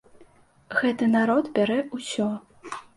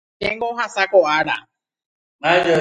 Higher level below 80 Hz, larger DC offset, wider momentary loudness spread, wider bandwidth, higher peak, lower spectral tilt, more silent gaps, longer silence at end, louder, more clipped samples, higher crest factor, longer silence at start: second, -66 dBFS vs -56 dBFS; neither; first, 14 LU vs 9 LU; about the same, 11.5 kHz vs 10.5 kHz; second, -8 dBFS vs -2 dBFS; about the same, -5 dB/octave vs -4.5 dB/octave; second, none vs 1.86-2.19 s; first, 0.15 s vs 0 s; second, -24 LUFS vs -18 LUFS; neither; about the same, 18 dB vs 18 dB; about the same, 0.2 s vs 0.2 s